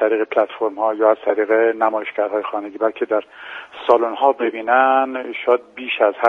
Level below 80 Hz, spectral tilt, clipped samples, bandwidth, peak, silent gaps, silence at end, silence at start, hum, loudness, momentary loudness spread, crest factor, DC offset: -70 dBFS; -5.5 dB/octave; under 0.1%; 5 kHz; 0 dBFS; none; 0 s; 0 s; none; -18 LUFS; 8 LU; 18 dB; under 0.1%